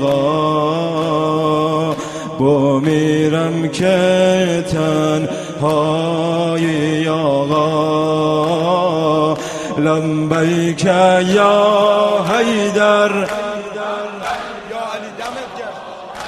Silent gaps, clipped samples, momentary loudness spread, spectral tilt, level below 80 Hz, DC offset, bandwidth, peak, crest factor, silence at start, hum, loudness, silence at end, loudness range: none; under 0.1%; 12 LU; -6 dB/octave; -52 dBFS; under 0.1%; 13.5 kHz; 0 dBFS; 16 dB; 0 s; none; -15 LUFS; 0 s; 3 LU